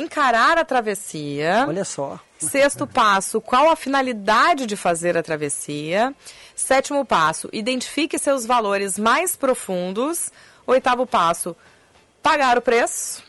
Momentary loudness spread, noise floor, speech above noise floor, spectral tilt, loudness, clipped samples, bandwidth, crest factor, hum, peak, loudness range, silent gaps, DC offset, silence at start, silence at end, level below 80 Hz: 10 LU; -55 dBFS; 35 dB; -3 dB/octave; -20 LUFS; under 0.1%; 12 kHz; 12 dB; none; -8 dBFS; 3 LU; none; under 0.1%; 0 s; 0.1 s; -56 dBFS